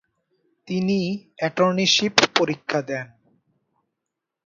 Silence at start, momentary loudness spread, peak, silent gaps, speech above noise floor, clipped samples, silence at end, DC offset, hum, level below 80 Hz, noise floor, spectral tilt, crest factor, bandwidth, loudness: 0.65 s; 13 LU; 0 dBFS; none; 62 dB; under 0.1%; 1.4 s; under 0.1%; none; -66 dBFS; -83 dBFS; -3.5 dB/octave; 24 dB; 7.8 kHz; -21 LUFS